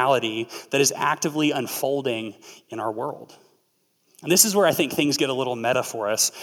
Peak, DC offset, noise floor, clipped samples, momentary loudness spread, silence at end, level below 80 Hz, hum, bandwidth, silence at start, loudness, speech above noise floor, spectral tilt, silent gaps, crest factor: -2 dBFS; under 0.1%; -68 dBFS; under 0.1%; 14 LU; 0 s; -74 dBFS; none; 18.5 kHz; 0 s; -22 LUFS; 45 dB; -2.5 dB/octave; none; 22 dB